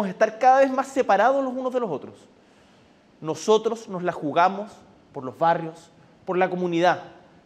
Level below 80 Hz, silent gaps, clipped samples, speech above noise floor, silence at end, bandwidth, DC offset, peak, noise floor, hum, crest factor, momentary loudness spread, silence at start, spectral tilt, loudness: -72 dBFS; none; under 0.1%; 33 dB; 0.35 s; 11.5 kHz; under 0.1%; -6 dBFS; -55 dBFS; none; 18 dB; 17 LU; 0 s; -5.5 dB/octave; -22 LUFS